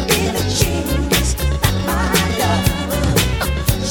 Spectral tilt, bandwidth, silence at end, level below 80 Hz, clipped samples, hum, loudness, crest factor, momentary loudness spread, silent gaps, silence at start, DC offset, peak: -4 dB/octave; 19 kHz; 0 s; -24 dBFS; under 0.1%; none; -17 LUFS; 14 dB; 3 LU; none; 0 s; under 0.1%; -2 dBFS